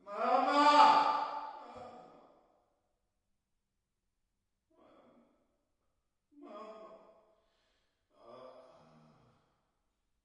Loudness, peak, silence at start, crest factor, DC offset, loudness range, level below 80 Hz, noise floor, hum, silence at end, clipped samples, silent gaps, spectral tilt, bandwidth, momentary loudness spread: -28 LUFS; -12 dBFS; 0.05 s; 26 dB; under 0.1%; 27 LU; -86 dBFS; -85 dBFS; none; 1.8 s; under 0.1%; none; -2.5 dB/octave; 10.5 kHz; 28 LU